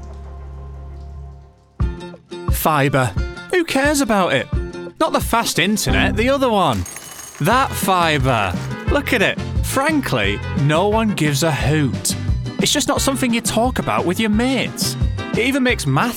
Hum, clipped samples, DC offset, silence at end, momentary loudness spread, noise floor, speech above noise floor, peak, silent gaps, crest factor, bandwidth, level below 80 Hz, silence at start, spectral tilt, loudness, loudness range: none; under 0.1%; under 0.1%; 0 s; 15 LU; -42 dBFS; 25 dB; -2 dBFS; none; 16 dB; 19.5 kHz; -30 dBFS; 0 s; -4.5 dB/octave; -18 LUFS; 2 LU